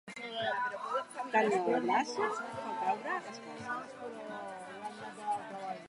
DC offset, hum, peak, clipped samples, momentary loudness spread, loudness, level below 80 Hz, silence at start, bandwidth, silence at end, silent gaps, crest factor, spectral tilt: under 0.1%; none; -16 dBFS; under 0.1%; 14 LU; -36 LUFS; -80 dBFS; 0.05 s; 11.5 kHz; 0 s; none; 20 dB; -4 dB/octave